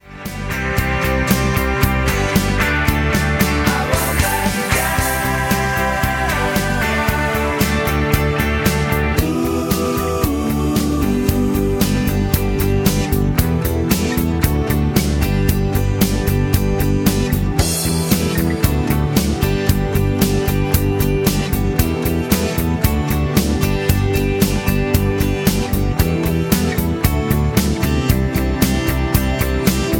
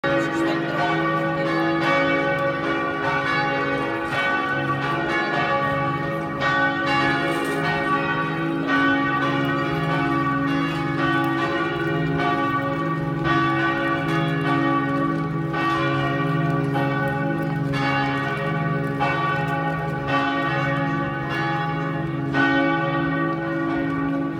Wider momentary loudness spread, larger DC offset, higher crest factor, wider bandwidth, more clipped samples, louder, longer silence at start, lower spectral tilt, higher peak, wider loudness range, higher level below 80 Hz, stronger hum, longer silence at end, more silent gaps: about the same, 2 LU vs 4 LU; neither; about the same, 16 dB vs 14 dB; first, 17 kHz vs 14 kHz; neither; first, -17 LUFS vs -22 LUFS; about the same, 0.05 s vs 0.05 s; about the same, -5.5 dB/octave vs -6.5 dB/octave; first, 0 dBFS vs -8 dBFS; about the same, 1 LU vs 1 LU; first, -24 dBFS vs -50 dBFS; neither; about the same, 0 s vs 0 s; neither